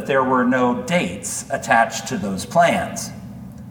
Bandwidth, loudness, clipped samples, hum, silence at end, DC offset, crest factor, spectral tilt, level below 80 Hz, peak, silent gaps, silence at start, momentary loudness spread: 19 kHz; -19 LUFS; under 0.1%; none; 0 s; under 0.1%; 18 dB; -4.5 dB/octave; -52 dBFS; -2 dBFS; none; 0 s; 14 LU